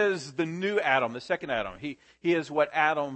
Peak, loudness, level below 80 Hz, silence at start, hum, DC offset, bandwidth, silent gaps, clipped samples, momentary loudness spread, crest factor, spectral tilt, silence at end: -8 dBFS; -28 LUFS; -64 dBFS; 0 s; none; under 0.1%; 8.8 kHz; none; under 0.1%; 9 LU; 20 dB; -5 dB/octave; 0 s